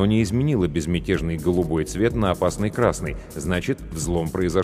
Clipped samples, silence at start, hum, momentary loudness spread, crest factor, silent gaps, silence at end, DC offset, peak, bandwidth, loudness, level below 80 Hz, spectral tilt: under 0.1%; 0 s; none; 6 LU; 18 dB; none; 0 s; under 0.1%; -4 dBFS; 15.5 kHz; -23 LUFS; -36 dBFS; -6 dB/octave